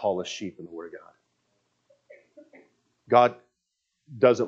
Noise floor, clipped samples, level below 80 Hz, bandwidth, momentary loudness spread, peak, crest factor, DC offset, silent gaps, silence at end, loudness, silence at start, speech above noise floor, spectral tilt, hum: -80 dBFS; under 0.1%; -80 dBFS; 7.8 kHz; 24 LU; -4 dBFS; 24 dB; under 0.1%; none; 0 s; -24 LUFS; 0 s; 56 dB; -5.5 dB/octave; 60 Hz at -65 dBFS